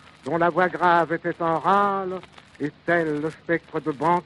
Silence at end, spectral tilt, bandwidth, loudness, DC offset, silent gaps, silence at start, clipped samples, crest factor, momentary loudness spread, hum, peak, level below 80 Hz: 0.05 s; -7 dB/octave; 11.5 kHz; -23 LUFS; under 0.1%; none; 0.25 s; under 0.1%; 20 dB; 11 LU; none; -4 dBFS; -62 dBFS